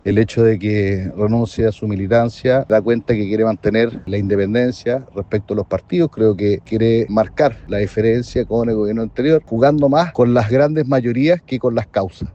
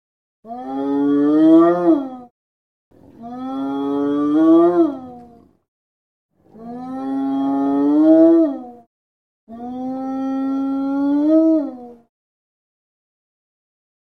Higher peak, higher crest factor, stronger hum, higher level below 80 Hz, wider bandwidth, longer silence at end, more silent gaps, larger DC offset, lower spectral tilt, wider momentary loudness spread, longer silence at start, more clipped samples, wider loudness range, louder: about the same, 0 dBFS vs -2 dBFS; about the same, 16 dB vs 16 dB; neither; first, -42 dBFS vs -64 dBFS; first, 8.2 kHz vs 4.4 kHz; second, 0.05 s vs 2.1 s; second, none vs 2.31-2.91 s, 5.68-6.29 s, 8.87-9.47 s; neither; about the same, -8 dB/octave vs -8.5 dB/octave; second, 7 LU vs 21 LU; second, 0.05 s vs 0.45 s; neither; about the same, 3 LU vs 4 LU; about the same, -17 LUFS vs -16 LUFS